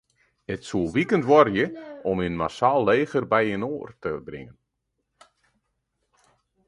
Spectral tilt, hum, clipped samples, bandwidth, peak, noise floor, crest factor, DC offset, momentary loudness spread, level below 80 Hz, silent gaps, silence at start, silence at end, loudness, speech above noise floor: -6.5 dB/octave; none; under 0.1%; 11 kHz; -2 dBFS; -78 dBFS; 22 dB; under 0.1%; 17 LU; -54 dBFS; none; 0.5 s; 2.2 s; -23 LUFS; 55 dB